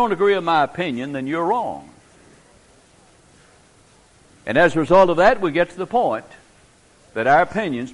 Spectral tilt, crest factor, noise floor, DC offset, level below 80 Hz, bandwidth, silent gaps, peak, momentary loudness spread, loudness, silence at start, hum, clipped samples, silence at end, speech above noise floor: -6 dB/octave; 18 dB; -53 dBFS; under 0.1%; -52 dBFS; 11.5 kHz; none; -2 dBFS; 13 LU; -18 LUFS; 0 s; none; under 0.1%; 0 s; 35 dB